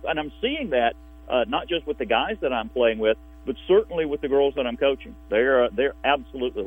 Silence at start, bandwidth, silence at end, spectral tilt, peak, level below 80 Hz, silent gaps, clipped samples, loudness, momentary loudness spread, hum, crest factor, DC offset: 0 s; 3.8 kHz; 0 s; -7 dB/octave; -4 dBFS; -46 dBFS; none; under 0.1%; -24 LUFS; 7 LU; none; 18 dB; under 0.1%